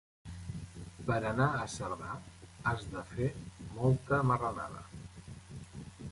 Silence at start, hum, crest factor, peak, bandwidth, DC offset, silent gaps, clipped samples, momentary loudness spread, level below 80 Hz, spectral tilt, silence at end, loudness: 0.25 s; none; 20 dB; -16 dBFS; 11.5 kHz; under 0.1%; none; under 0.1%; 19 LU; -54 dBFS; -6.5 dB/octave; 0 s; -35 LUFS